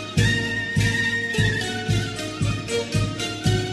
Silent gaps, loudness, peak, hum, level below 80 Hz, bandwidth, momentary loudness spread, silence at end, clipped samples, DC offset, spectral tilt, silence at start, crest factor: none; -23 LUFS; -6 dBFS; none; -38 dBFS; 12.5 kHz; 5 LU; 0 s; under 0.1%; under 0.1%; -4.5 dB/octave; 0 s; 16 dB